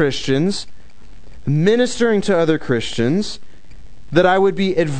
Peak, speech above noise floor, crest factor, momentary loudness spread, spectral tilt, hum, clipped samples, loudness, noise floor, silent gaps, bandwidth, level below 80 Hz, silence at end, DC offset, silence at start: 0 dBFS; 27 dB; 18 dB; 13 LU; -6 dB/octave; none; under 0.1%; -17 LUFS; -44 dBFS; none; 9.4 kHz; -44 dBFS; 0 s; 4%; 0 s